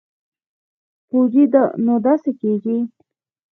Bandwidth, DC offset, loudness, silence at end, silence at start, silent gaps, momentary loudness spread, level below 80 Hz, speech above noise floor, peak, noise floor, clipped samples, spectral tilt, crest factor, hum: 3.3 kHz; under 0.1%; -17 LUFS; 0.65 s; 1.15 s; none; 9 LU; -72 dBFS; 50 dB; -2 dBFS; -66 dBFS; under 0.1%; -11.5 dB/octave; 18 dB; none